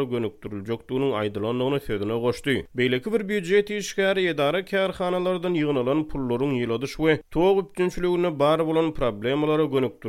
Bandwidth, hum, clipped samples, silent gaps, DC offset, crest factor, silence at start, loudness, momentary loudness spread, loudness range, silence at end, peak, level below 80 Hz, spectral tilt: 15.5 kHz; none; under 0.1%; none; under 0.1%; 16 dB; 0 s; -24 LUFS; 6 LU; 2 LU; 0 s; -8 dBFS; -48 dBFS; -6 dB/octave